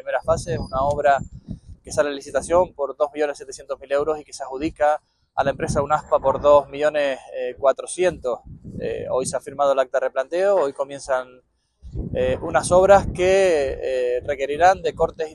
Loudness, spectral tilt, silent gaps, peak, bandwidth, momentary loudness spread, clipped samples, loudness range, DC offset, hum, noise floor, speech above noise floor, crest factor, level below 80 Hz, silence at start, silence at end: -21 LUFS; -5 dB/octave; none; -2 dBFS; 12 kHz; 14 LU; under 0.1%; 5 LU; under 0.1%; none; -45 dBFS; 24 dB; 20 dB; -42 dBFS; 0.05 s; 0 s